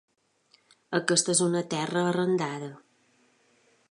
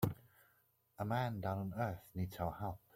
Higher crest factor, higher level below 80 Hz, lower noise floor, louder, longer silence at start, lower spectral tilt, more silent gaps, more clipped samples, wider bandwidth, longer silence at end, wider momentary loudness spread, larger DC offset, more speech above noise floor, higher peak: about the same, 22 dB vs 20 dB; second, -74 dBFS vs -64 dBFS; second, -66 dBFS vs -75 dBFS; first, -26 LUFS vs -42 LUFS; first, 0.9 s vs 0 s; second, -3.5 dB/octave vs -7.5 dB/octave; neither; neither; second, 11.5 kHz vs 16.5 kHz; first, 1.15 s vs 0.2 s; first, 11 LU vs 8 LU; neither; first, 40 dB vs 35 dB; first, -8 dBFS vs -22 dBFS